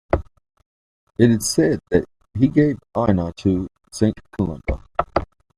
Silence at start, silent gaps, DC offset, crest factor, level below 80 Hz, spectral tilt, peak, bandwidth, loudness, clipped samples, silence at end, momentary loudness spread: 0.15 s; 0.66-1.07 s; under 0.1%; 20 dB; -38 dBFS; -6 dB/octave; 0 dBFS; 15 kHz; -21 LUFS; under 0.1%; 0.35 s; 9 LU